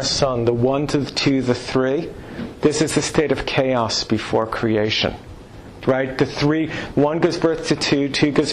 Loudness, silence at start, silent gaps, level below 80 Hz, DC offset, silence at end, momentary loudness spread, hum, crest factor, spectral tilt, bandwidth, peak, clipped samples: -20 LUFS; 0 s; none; -42 dBFS; under 0.1%; 0 s; 7 LU; none; 14 dB; -5 dB/octave; 12.5 kHz; -6 dBFS; under 0.1%